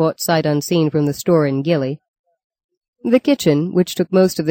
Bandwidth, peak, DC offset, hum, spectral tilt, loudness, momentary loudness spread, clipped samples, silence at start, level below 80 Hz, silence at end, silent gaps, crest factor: 17 kHz; -2 dBFS; under 0.1%; none; -6 dB/octave; -17 LUFS; 4 LU; under 0.1%; 0 s; -58 dBFS; 0 s; 2.08-2.24 s, 2.44-2.50 s, 2.64-2.69 s, 2.77-2.81 s, 2.88-2.93 s; 14 dB